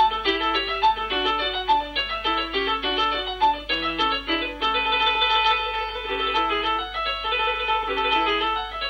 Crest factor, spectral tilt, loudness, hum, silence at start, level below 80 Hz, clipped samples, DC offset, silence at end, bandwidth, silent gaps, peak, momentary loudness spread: 16 dB; -3.5 dB/octave; -22 LUFS; 50 Hz at -45 dBFS; 0 s; -44 dBFS; under 0.1%; under 0.1%; 0 s; 10.5 kHz; none; -8 dBFS; 5 LU